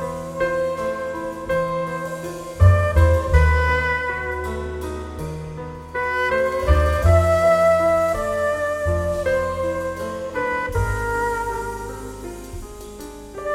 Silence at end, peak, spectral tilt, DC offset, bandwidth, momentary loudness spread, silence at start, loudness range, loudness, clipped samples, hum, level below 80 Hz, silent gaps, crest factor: 0 s; -2 dBFS; -6.5 dB/octave; under 0.1%; 14.5 kHz; 16 LU; 0 s; 7 LU; -21 LUFS; under 0.1%; none; -28 dBFS; none; 18 dB